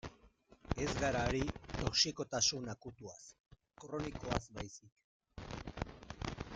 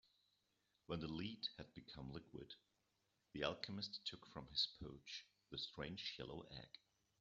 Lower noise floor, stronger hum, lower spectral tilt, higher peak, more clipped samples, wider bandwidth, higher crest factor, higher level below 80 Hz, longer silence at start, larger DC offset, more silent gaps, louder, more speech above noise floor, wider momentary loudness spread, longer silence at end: second, -66 dBFS vs -86 dBFS; neither; about the same, -3.5 dB/octave vs -3 dB/octave; first, -18 dBFS vs -26 dBFS; neither; first, 11 kHz vs 7.4 kHz; about the same, 24 dB vs 26 dB; first, -52 dBFS vs -72 dBFS; second, 0.05 s vs 0.9 s; neither; first, 3.40-3.44 s, 4.92-4.96 s, 5.04-5.20 s vs none; first, -38 LUFS vs -49 LUFS; second, 28 dB vs 35 dB; first, 21 LU vs 14 LU; second, 0 s vs 0.45 s